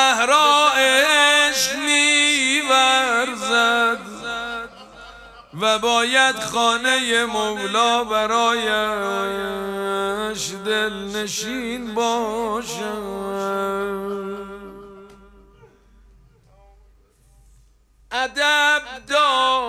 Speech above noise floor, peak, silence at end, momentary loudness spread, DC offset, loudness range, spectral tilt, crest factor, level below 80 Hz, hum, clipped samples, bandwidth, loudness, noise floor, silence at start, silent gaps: 34 dB; -2 dBFS; 0 s; 14 LU; under 0.1%; 13 LU; -1 dB/octave; 18 dB; -54 dBFS; none; under 0.1%; 16.5 kHz; -18 LUFS; -55 dBFS; 0 s; none